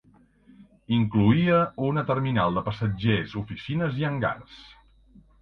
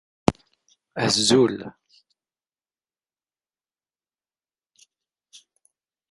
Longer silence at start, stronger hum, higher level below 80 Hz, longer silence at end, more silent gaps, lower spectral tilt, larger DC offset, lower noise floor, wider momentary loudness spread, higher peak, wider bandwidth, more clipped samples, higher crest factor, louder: first, 0.6 s vs 0.3 s; neither; about the same, -50 dBFS vs -54 dBFS; second, 0.75 s vs 4.4 s; neither; first, -9.5 dB/octave vs -4 dB/octave; neither; second, -57 dBFS vs under -90 dBFS; second, 11 LU vs 22 LU; second, -6 dBFS vs 0 dBFS; second, 6 kHz vs 11.5 kHz; neither; second, 20 dB vs 28 dB; second, -25 LUFS vs -21 LUFS